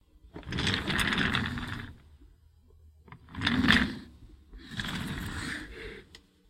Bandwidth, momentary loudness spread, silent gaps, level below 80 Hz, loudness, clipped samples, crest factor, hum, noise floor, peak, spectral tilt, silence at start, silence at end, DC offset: 16.5 kHz; 22 LU; none; -48 dBFS; -30 LUFS; under 0.1%; 28 dB; none; -59 dBFS; -4 dBFS; -4 dB/octave; 0.25 s; 0.3 s; under 0.1%